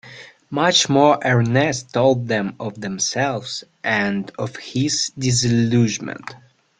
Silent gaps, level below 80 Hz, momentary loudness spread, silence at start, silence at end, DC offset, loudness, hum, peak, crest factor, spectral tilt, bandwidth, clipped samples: none; -54 dBFS; 14 LU; 0.05 s; 0.4 s; under 0.1%; -19 LUFS; none; -2 dBFS; 18 dB; -4 dB/octave; 9.6 kHz; under 0.1%